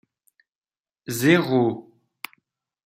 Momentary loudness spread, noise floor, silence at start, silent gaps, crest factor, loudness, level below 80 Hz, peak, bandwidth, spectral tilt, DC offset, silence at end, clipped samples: 21 LU; under -90 dBFS; 1.1 s; none; 22 dB; -21 LUFS; -68 dBFS; -4 dBFS; 16 kHz; -5.5 dB/octave; under 0.1%; 1.05 s; under 0.1%